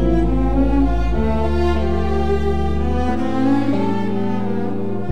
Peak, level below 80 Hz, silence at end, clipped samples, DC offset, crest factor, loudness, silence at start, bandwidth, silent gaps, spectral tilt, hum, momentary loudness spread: -6 dBFS; -22 dBFS; 0 s; under 0.1%; 8%; 12 dB; -19 LUFS; 0 s; 8.4 kHz; none; -8.5 dB/octave; none; 4 LU